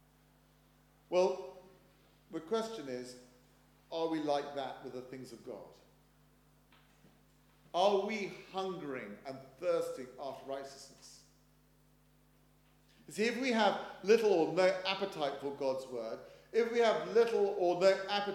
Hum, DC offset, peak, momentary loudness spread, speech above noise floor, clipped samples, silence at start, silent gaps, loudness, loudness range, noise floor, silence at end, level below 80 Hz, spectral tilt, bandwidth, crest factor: 50 Hz at -70 dBFS; under 0.1%; -16 dBFS; 19 LU; 33 dB; under 0.1%; 1.1 s; none; -34 LUFS; 10 LU; -67 dBFS; 0 s; -74 dBFS; -4.5 dB/octave; 16 kHz; 20 dB